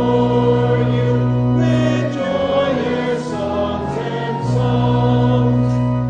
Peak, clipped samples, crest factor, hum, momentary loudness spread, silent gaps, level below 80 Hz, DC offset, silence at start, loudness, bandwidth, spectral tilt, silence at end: -4 dBFS; under 0.1%; 12 dB; none; 6 LU; none; -38 dBFS; under 0.1%; 0 s; -17 LUFS; 8 kHz; -8 dB/octave; 0 s